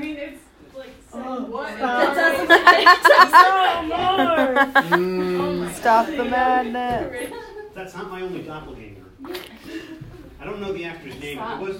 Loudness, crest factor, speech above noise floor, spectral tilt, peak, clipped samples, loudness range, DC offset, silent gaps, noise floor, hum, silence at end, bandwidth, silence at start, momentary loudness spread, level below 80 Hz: -16 LUFS; 20 dB; 24 dB; -4 dB/octave; 0 dBFS; under 0.1%; 19 LU; under 0.1%; none; -42 dBFS; none; 0 s; 16.5 kHz; 0 s; 24 LU; -50 dBFS